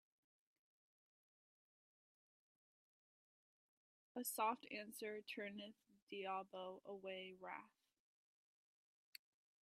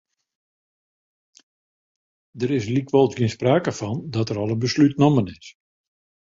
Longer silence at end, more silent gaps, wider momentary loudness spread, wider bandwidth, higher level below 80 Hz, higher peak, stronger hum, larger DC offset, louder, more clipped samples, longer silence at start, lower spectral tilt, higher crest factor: first, 1.95 s vs 0.7 s; first, 6.02-6.07 s vs none; first, 17 LU vs 9 LU; first, 13 kHz vs 7.8 kHz; second, under -90 dBFS vs -56 dBFS; second, -30 dBFS vs -4 dBFS; neither; neither; second, -49 LUFS vs -21 LUFS; neither; first, 4.15 s vs 2.35 s; second, -2.5 dB/octave vs -7 dB/octave; about the same, 24 dB vs 20 dB